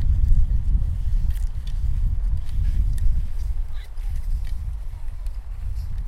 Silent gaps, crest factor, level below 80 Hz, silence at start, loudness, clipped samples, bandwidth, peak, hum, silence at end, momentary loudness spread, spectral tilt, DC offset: none; 16 dB; -22 dBFS; 0 s; -28 LUFS; under 0.1%; 5 kHz; -4 dBFS; none; 0 s; 12 LU; -7 dB/octave; under 0.1%